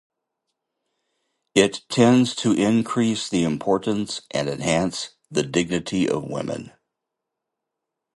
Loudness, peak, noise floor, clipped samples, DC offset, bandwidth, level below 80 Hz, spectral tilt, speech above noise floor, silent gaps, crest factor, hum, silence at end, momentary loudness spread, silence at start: -22 LUFS; -2 dBFS; -83 dBFS; under 0.1%; under 0.1%; 11.5 kHz; -56 dBFS; -5 dB/octave; 62 dB; none; 20 dB; none; 1.5 s; 9 LU; 1.55 s